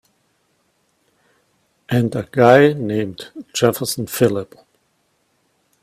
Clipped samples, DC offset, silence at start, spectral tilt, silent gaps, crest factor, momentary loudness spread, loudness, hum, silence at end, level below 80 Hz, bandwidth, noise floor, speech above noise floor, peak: under 0.1%; under 0.1%; 1.9 s; -5.5 dB/octave; none; 20 dB; 16 LU; -17 LUFS; none; 1.4 s; -56 dBFS; 16 kHz; -65 dBFS; 48 dB; 0 dBFS